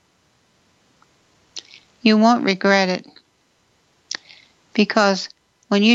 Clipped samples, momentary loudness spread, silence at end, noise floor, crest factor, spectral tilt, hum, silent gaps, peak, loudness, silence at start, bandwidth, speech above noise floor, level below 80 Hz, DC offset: under 0.1%; 21 LU; 0 s; -62 dBFS; 20 dB; -4.5 dB/octave; none; none; 0 dBFS; -18 LUFS; 1.55 s; 7.8 kHz; 46 dB; -70 dBFS; under 0.1%